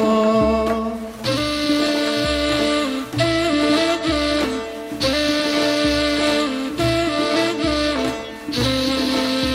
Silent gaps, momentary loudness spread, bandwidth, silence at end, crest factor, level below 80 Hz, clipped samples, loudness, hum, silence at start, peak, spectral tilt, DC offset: none; 6 LU; 16 kHz; 0 s; 14 dB; -38 dBFS; under 0.1%; -19 LUFS; none; 0 s; -4 dBFS; -4.5 dB/octave; under 0.1%